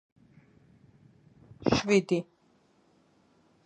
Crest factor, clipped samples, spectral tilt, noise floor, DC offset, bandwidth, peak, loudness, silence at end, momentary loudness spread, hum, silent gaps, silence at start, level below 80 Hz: 24 dB; under 0.1%; -5.5 dB/octave; -66 dBFS; under 0.1%; 10 kHz; -10 dBFS; -28 LUFS; 1.45 s; 11 LU; none; none; 1.6 s; -58 dBFS